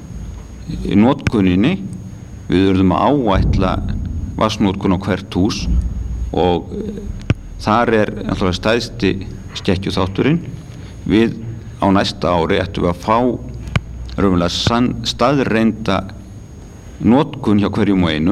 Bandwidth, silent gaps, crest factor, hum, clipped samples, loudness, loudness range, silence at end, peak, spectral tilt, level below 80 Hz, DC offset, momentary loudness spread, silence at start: 12.5 kHz; none; 16 dB; none; under 0.1%; -17 LUFS; 3 LU; 0 s; -2 dBFS; -6.5 dB/octave; -30 dBFS; under 0.1%; 15 LU; 0 s